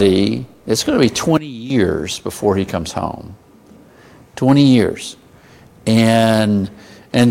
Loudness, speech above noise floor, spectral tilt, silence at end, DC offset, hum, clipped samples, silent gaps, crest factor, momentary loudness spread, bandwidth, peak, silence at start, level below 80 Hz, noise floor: -16 LUFS; 30 dB; -5.5 dB/octave; 0 s; under 0.1%; none; under 0.1%; none; 16 dB; 14 LU; 16 kHz; 0 dBFS; 0 s; -46 dBFS; -45 dBFS